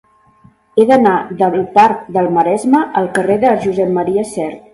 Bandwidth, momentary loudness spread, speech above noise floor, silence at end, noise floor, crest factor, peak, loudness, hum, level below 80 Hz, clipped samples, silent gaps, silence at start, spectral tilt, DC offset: 11.5 kHz; 6 LU; 36 dB; 0.15 s; -48 dBFS; 14 dB; 0 dBFS; -13 LUFS; none; -54 dBFS; under 0.1%; none; 0.75 s; -6.5 dB/octave; under 0.1%